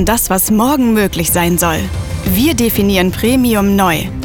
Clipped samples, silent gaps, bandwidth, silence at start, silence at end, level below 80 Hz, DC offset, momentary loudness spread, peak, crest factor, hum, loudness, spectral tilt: under 0.1%; none; over 20 kHz; 0 s; 0 s; -28 dBFS; under 0.1%; 4 LU; -2 dBFS; 12 dB; none; -12 LUFS; -4.5 dB/octave